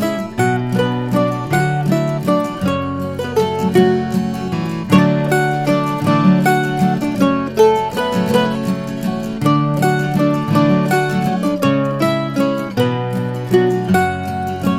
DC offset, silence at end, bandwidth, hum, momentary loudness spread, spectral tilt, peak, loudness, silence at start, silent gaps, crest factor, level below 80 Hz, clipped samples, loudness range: under 0.1%; 0 s; 16 kHz; none; 7 LU; -6.5 dB/octave; 0 dBFS; -16 LUFS; 0 s; none; 16 dB; -46 dBFS; under 0.1%; 2 LU